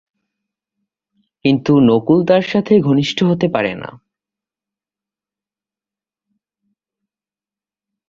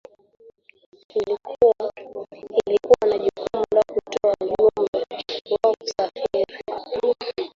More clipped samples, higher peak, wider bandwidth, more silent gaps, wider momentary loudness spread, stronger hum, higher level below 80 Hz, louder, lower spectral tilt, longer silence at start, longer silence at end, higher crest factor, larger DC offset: neither; about the same, -2 dBFS vs -2 dBFS; about the same, 7.4 kHz vs 7.6 kHz; second, none vs 4.88-4.93 s; about the same, 9 LU vs 11 LU; neither; about the same, -56 dBFS vs -58 dBFS; first, -14 LUFS vs -22 LUFS; first, -7.5 dB/octave vs -4.5 dB/octave; first, 1.45 s vs 1.15 s; first, 4.15 s vs 0.05 s; about the same, 18 dB vs 20 dB; neither